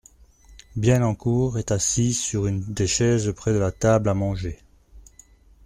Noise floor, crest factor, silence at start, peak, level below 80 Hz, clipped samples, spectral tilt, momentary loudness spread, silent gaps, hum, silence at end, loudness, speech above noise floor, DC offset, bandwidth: -52 dBFS; 18 dB; 0.5 s; -6 dBFS; -44 dBFS; under 0.1%; -5.5 dB/octave; 7 LU; none; none; 0.65 s; -22 LUFS; 31 dB; under 0.1%; 14 kHz